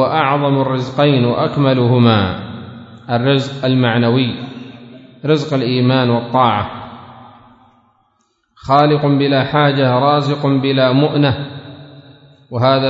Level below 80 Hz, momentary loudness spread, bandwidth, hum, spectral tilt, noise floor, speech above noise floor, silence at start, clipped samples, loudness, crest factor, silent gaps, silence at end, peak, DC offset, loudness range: -52 dBFS; 18 LU; 7.8 kHz; none; -8 dB/octave; -62 dBFS; 49 dB; 0 s; under 0.1%; -14 LUFS; 16 dB; none; 0 s; 0 dBFS; under 0.1%; 4 LU